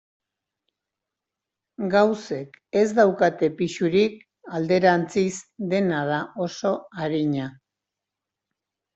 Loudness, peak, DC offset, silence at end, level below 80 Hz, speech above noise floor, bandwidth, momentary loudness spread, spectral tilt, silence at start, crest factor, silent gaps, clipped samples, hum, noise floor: -23 LUFS; -4 dBFS; under 0.1%; 1.45 s; -66 dBFS; 64 dB; 8.2 kHz; 11 LU; -6 dB/octave; 1.8 s; 20 dB; none; under 0.1%; none; -86 dBFS